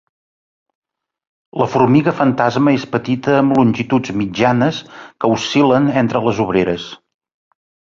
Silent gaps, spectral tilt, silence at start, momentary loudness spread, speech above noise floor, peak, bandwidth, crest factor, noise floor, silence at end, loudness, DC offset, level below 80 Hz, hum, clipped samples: none; -6.5 dB/octave; 1.55 s; 8 LU; over 75 dB; -2 dBFS; 7.4 kHz; 14 dB; under -90 dBFS; 0.95 s; -15 LUFS; under 0.1%; -50 dBFS; none; under 0.1%